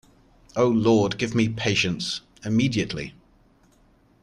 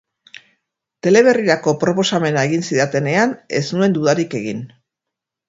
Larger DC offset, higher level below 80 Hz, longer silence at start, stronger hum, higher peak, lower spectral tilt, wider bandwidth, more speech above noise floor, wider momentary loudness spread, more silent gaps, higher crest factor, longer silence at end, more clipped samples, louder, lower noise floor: neither; first, -52 dBFS vs -60 dBFS; second, 0.55 s vs 1.05 s; neither; second, -8 dBFS vs 0 dBFS; about the same, -5.5 dB/octave vs -5 dB/octave; first, 11 kHz vs 7.8 kHz; second, 36 dB vs 67 dB; about the same, 12 LU vs 11 LU; neither; about the same, 16 dB vs 18 dB; first, 1.1 s vs 0.8 s; neither; second, -23 LUFS vs -17 LUFS; second, -59 dBFS vs -83 dBFS